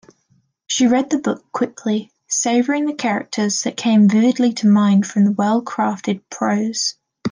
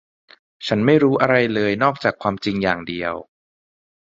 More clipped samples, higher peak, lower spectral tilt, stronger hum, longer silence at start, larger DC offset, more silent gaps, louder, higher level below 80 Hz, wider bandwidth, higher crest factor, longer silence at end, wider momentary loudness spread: neither; second, -6 dBFS vs 0 dBFS; second, -4.5 dB/octave vs -7 dB/octave; neither; about the same, 0.7 s vs 0.6 s; neither; neither; about the same, -18 LUFS vs -19 LUFS; second, -66 dBFS vs -54 dBFS; first, 10 kHz vs 7.8 kHz; second, 12 dB vs 20 dB; second, 0 s vs 0.85 s; about the same, 9 LU vs 11 LU